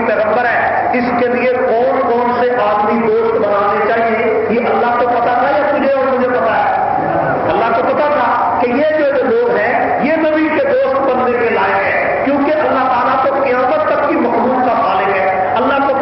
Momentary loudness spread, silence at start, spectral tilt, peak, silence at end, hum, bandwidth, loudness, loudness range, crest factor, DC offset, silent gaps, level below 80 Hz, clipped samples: 1 LU; 0 s; -10.5 dB/octave; -4 dBFS; 0 s; none; 5.8 kHz; -13 LUFS; 0 LU; 10 dB; under 0.1%; none; -48 dBFS; under 0.1%